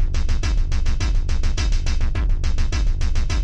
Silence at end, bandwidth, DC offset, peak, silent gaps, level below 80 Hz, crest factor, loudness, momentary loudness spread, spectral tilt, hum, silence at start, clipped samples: 0 s; 8.2 kHz; 0.7%; -8 dBFS; none; -18 dBFS; 8 dB; -24 LUFS; 1 LU; -5 dB/octave; none; 0 s; under 0.1%